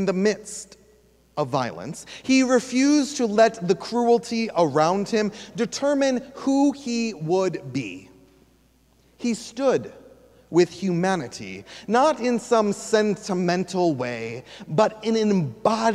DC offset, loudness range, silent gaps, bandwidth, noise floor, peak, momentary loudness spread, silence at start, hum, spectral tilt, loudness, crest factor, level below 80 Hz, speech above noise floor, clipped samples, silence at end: under 0.1%; 6 LU; none; 12.5 kHz; -59 dBFS; -4 dBFS; 14 LU; 0 s; none; -5 dB/octave; -23 LUFS; 18 dB; -62 dBFS; 37 dB; under 0.1%; 0 s